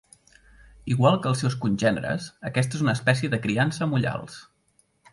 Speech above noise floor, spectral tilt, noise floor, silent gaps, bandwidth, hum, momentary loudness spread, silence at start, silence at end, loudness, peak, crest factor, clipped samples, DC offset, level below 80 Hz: 42 dB; -6 dB/octave; -66 dBFS; none; 11.5 kHz; none; 11 LU; 0.85 s; 0.7 s; -24 LUFS; -6 dBFS; 20 dB; under 0.1%; under 0.1%; -56 dBFS